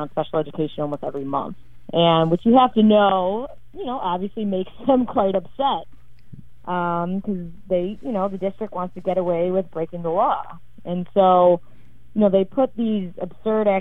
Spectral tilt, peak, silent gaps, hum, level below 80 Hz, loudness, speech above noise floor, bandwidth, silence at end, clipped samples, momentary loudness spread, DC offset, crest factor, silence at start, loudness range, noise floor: -9.5 dB/octave; -2 dBFS; none; none; -52 dBFS; -21 LUFS; 24 dB; 3.9 kHz; 0 s; under 0.1%; 14 LU; 1%; 18 dB; 0 s; 6 LU; -44 dBFS